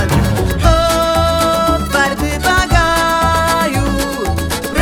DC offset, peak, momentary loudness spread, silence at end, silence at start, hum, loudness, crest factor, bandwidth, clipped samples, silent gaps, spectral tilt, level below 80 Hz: 0.1%; 0 dBFS; 6 LU; 0 s; 0 s; none; -14 LUFS; 14 dB; 19 kHz; under 0.1%; none; -4.5 dB/octave; -22 dBFS